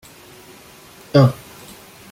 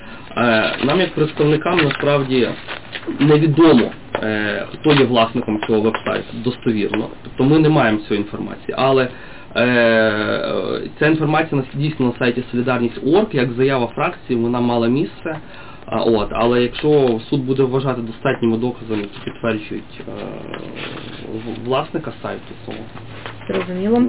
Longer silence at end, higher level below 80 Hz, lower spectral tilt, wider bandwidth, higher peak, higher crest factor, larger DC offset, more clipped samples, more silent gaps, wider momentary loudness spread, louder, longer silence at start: first, 0.75 s vs 0 s; second, -54 dBFS vs -46 dBFS; second, -7.5 dB/octave vs -10.5 dB/octave; first, 16 kHz vs 4 kHz; first, -2 dBFS vs -6 dBFS; first, 20 dB vs 12 dB; second, under 0.1% vs 1%; neither; neither; first, 25 LU vs 15 LU; about the same, -16 LUFS vs -18 LUFS; first, 1.15 s vs 0 s